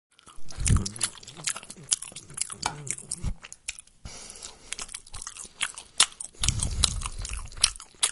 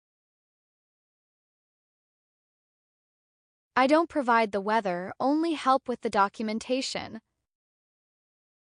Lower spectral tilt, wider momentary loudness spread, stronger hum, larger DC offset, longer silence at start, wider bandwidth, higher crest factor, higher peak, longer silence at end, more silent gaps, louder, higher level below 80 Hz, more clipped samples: second, -1.5 dB/octave vs -4.5 dB/octave; first, 15 LU vs 10 LU; neither; neither; second, 0.25 s vs 3.75 s; first, 16 kHz vs 10 kHz; first, 30 dB vs 20 dB; first, 0 dBFS vs -10 dBFS; second, 0 s vs 1.6 s; neither; about the same, -29 LUFS vs -27 LUFS; first, -38 dBFS vs -72 dBFS; neither